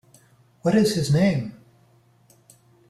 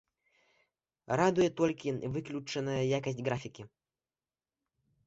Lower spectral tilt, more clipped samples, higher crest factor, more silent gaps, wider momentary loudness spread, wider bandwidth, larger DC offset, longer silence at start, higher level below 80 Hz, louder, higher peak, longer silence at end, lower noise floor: about the same, -6.5 dB/octave vs -6 dB/octave; neither; second, 16 dB vs 22 dB; neither; about the same, 9 LU vs 10 LU; first, 14 kHz vs 8 kHz; neither; second, 0.65 s vs 1.1 s; first, -56 dBFS vs -66 dBFS; first, -21 LUFS vs -33 LUFS; first, -8 dBFS vs -14 dBFS; about the same, 1.35 s vs 1.4 s; second, -58 dBFS vs under -90 dBFS